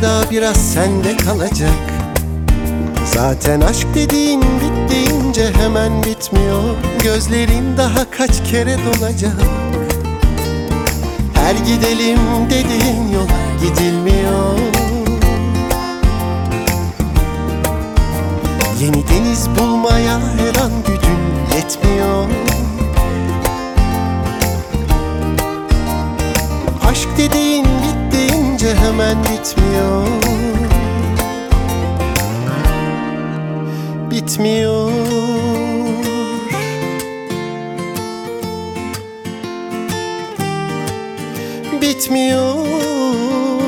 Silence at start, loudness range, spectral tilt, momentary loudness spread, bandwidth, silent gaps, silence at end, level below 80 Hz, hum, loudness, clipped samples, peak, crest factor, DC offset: 0 s; 5 LU; -5 dB/octave; 8 LU; over 20 kHz; none; 0 s; -20 dBFS; none; -16 LUFS; under 0.1%; 0 dBFS; 14 dB; under 0.1%